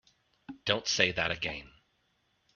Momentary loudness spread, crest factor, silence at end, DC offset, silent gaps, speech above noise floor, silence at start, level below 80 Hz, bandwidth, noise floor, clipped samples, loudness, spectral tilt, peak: 15 LU; 28 dB; 0.9 s; under 0.1%; none; 43 dB; 0.5 s; -60 dBFS; 7.2 kHz; -74 dBFS; under 0.1%; -30 LUFS; -1 dB/octave; -8 dBFS